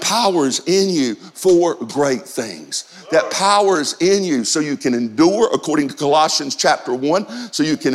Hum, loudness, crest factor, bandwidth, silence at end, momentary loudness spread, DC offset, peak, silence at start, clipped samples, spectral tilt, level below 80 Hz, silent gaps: none; -17 LUFS; 14 dB; 15 kHz; 0 s; 8 LU; under 0.1%; -2 dBFS; 0 s; under 0.1%; -3.5 dB/octave; -62 dBFS; none